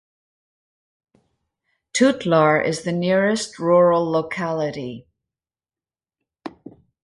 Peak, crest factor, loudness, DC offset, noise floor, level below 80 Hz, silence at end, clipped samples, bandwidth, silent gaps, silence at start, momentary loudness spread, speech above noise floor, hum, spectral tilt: -4 dBFS; 18 dB; -19 LUFS; under 0.1%; under -90 dBFS; -62 dBFS; 0.35 s; under 0.1%; 11.5 kHz; none; 1.95 s; 22 LU; over 71 dB; none; -5 dB/octave